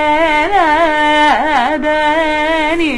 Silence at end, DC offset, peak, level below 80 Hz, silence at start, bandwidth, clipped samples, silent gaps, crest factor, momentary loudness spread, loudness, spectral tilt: 0 s; under 0.1%; 0 dBFS; -34 dBFS; 0 s; 11 kHz; under 0.1%; none; 12 dB; 3 LU; -12 LUFS; -3.5 dB/octave